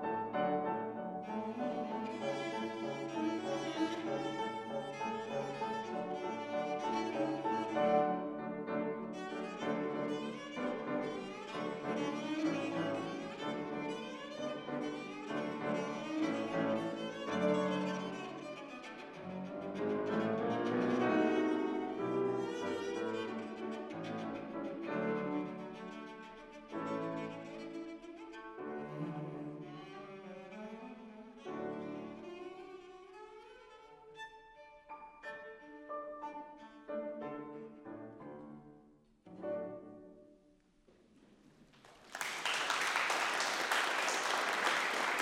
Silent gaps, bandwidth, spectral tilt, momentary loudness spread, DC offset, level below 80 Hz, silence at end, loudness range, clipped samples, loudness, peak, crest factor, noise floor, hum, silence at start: none; 16 kHz; -4.5 dB/octave; 18 LU; under 0.1%; -76 dBFS; 0 s; 13 LU; under 0.1%; -38 LUFS; -16 dBFS; 22 dB; -68 dBFS; none; 0 s